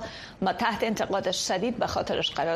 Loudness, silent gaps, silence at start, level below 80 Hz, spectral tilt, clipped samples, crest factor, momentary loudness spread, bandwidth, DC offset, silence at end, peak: -27 LUFS; none; 0 s; -54 dBFS; -3.5 dB/octave; under 0.1%; 16 dB; 3 LU; 15 kHz; under 0.1%; 0 s; -12 dBFS